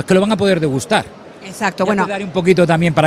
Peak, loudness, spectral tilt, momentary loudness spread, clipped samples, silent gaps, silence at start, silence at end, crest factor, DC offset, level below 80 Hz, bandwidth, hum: 0 dBFS; -15 LUFS; -6 dB/octave; 13 LU; under 0.1%; none; 0 s; 0 s; 16 dB; under 0.1%; -48 dBFS; 15 kHz; none